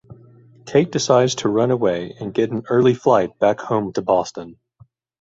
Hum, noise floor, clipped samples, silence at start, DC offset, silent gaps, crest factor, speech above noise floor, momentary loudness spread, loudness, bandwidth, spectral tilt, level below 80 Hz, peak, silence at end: none; -53 dBFS; under 0.1%; 0.1 s; under 0.1%; none; 18 dB; 35 dB; 7 LU; -19 LUFS; 8 kHz; -5.5 dB/octave; -56 dBFS; -2 dBFS; 0.7 s